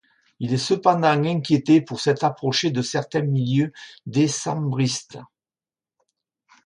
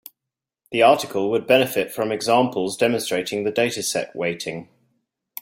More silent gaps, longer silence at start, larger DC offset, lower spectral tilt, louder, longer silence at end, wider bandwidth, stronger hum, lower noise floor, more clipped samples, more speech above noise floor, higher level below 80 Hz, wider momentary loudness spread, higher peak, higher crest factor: neither; second, 0.4 s vs 0.7 s; neither; first, -5.5 dB/octave vs -3.5 dB/octave; about the same, -22 LUFS vs -21 LUFS; first, 1.4 s vs 0.75 s; second, 11.5 kHz vs 16.5 kHz; neither; first, under -90 dBFS vs -86 dBFS; neither; first, over 69 dB vs 65 dB; about the same, -64 dBFS vs -64 dBFS; about the same, 9 LU vs 11 LU; about the same, -2 dBFS vs -2 dBFS; about the same, 20 dB vs 20 dB